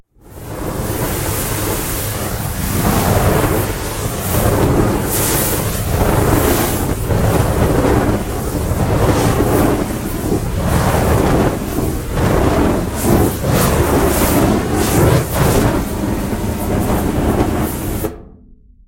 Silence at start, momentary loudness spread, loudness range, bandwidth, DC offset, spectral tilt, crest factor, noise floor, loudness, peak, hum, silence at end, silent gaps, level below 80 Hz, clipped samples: 0.3 s; 7 LU; 3 LU; 16.5 kHz; under 0.1%; -5.5 dB/octave; 16 dB; -43 dBFS; -16 LUFS; 0 dBFS; none; 0.35 s; none; -24 dBFS; under 0.1%